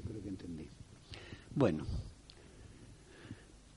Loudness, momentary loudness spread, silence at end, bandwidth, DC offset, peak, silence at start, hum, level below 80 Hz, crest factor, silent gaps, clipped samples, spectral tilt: -39 LUFS; 24 LU; 0 s; 11.5 kHz; under 0.1%; -16 dBFS; 0 s; none; -54 dBFS; 26 dB; none; under 0.1%; -7.5 dB/octave